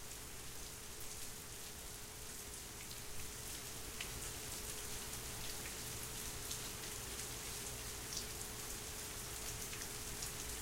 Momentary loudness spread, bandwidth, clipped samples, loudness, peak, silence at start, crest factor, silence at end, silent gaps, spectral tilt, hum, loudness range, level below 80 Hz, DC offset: 5 LU; 16 kHz; under 0.1%; -45 LUFS; -24 dBFS; 0 s; 24 dB; 0 s; none; -1.5 dB/octave; none; 3 LU; -56 dBFS; under 0.1%